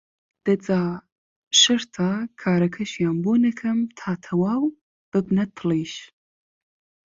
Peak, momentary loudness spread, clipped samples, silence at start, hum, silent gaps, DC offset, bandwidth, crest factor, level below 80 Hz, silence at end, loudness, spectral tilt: -2 dBFS; 11 LU; under 0.1%; 0.45 s; none; 1.12-1.51 s, 4.81-5.12 s; under 0.1%; 7.8 kHz; 22 dB; -62 dBFS; 1.05 s; -22 LUFS; -4 dB/octave